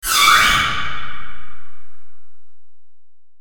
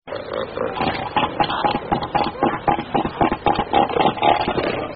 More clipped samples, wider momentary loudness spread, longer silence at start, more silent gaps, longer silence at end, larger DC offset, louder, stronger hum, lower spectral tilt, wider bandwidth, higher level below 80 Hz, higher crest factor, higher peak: neither; first, 22 LU vs 7 LU; about the same, 0 s vs 0.05 s; neither; about the same, 0 s vs 0 s; neither; first, -13 LUFS vs -20 LUFS; neither; second, 0 dB/octave vs -3.5 dB/octave; first, over 20 kHz vs 5.2 kHz; about the same, -38 dBFS vs -42 dBFS; about the same, 18 dB vs 18 dB; first, 0 dBFS vs -4 dBFS